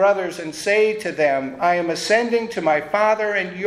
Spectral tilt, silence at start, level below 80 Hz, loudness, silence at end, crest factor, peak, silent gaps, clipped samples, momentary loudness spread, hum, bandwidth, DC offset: -4 dB/octave; 0 s; -64 dBFS; -20 LUFS; 0 s; 14 dB; -6 dBFS; none; under 0.1%; 4 LU; none; 14 kHz; under 0.1%